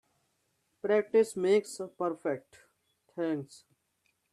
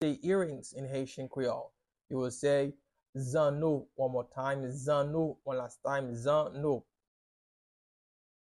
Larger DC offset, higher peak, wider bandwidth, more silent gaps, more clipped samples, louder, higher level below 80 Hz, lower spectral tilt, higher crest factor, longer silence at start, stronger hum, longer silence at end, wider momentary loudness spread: neither; about the same, -16 dBFS vs -18 dBFS; about the same, 12.5 kHz vs 12 kHz; second, none vs 3.09-3.13 s; neither; first, -31 LUFS vs -34 LUFS; second, -80 dBFS vs -68 dBFS; about the same, -5.5 dB/octave vs -6.5 dB/octave; about the same, 18 dB vs 16 dB; first, 0.85 s vs 0 s; neither; second, 0.75 s vs 1.6 s; first, 14 LU vs 9 LU